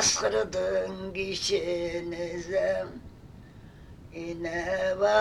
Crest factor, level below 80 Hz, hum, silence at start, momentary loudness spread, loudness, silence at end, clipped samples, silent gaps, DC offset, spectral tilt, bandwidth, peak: 18 dB; -52 dBFS; none; 0 s; 23 LU; -29 LUFS; 0 s; under 0.1%; none; under 0.1%; -2.5 dB/octave; 13.5 kHz; -12 dBFS